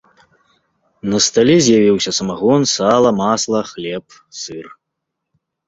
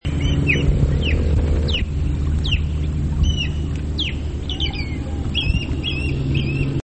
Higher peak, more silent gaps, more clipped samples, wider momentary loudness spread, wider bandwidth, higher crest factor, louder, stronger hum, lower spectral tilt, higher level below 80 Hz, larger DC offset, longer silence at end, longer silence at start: about the same, -2 dBFS vs -4 dBFS; neither; neither; first, 17 LU vs 6 LU; about the same, 8 kHz vs 8.6 kHz; about the same, 16 dB vs 16 dB; first, -14 LUFS vs -21 LUFS; neither; second, -4 dB/octave vs -6 dB/octave; second, -54 dBFS vs -22 dBFS; second, under 0.1% vs 0.9%; first, 1 s vs 0 s; first, 1.05 s vs 0 s